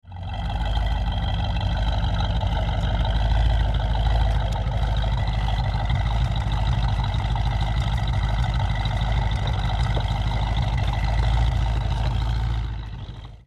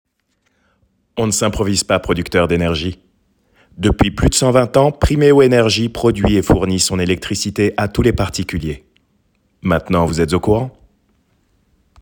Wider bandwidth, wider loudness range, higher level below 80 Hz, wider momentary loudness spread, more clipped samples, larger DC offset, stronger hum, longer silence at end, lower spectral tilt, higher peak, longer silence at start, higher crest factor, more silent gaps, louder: second, 8 kHz vs 18.5 kHz; second, 1 LU vs 6 LU; first, -24 dBFS vs -30 dBFS; second, 3 LU vs 10 LU; neither; neither; neither; second, 0.1 s vs 1.3 s; first, -6.5 dB/octave vs -5 dB/octave; second, -10 dBFS vs 0 dBFS; second, 0.05 s vs 1.15 s; about the same, 12 dB vs 16 dB; neither; second, -25 LUFS vs -15 LUFS